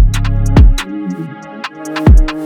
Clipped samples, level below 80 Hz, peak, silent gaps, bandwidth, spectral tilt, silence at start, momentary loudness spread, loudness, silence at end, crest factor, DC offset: under 0.1%; -12 dBFS; 0 dBFS; none; 12.5 kHz; -6.5 dB/octave; 0 s; 16 LU; -13 LUFS; 0 s; 10 dB; under 0.1%